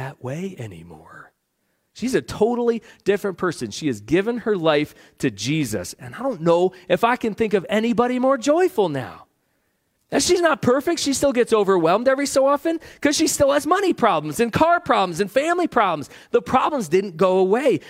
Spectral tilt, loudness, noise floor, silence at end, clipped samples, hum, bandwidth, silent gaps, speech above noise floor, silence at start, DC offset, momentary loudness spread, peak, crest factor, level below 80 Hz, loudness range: -4.5 dB/octave; -20 LUFS; -71 dBFS; 0 s; under 0.1%; none; 16 kHz; none; 51 dB; 0 s; under 0.1%; 9 LU; -2 dBFS; 18 dB; -54 dBFS; 5 LU